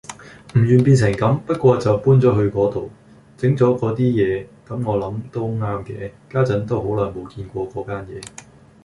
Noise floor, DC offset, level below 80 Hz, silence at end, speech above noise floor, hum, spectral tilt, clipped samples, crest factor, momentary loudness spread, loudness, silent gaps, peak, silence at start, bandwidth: -39 dBFS; under 0.1%; -46 dBFS; 0.55 s; 20 dB; none; -8 dB/octave; under 0.1%; 16 dB; 17 LU; -19 LUFS; none; -2 dBFS; 0.1 s; 11.5 kHz